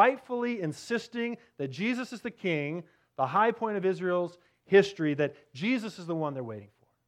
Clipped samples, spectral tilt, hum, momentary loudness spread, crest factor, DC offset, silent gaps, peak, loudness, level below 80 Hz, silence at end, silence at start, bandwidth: under 0.1%; -6 dB/octave; none; 14 LU; 22 dB; under 0.1%; none; -8 dBFS; -30 LUFS; -78 dBFS; 0.4 s; 0 s; 11.5 kHz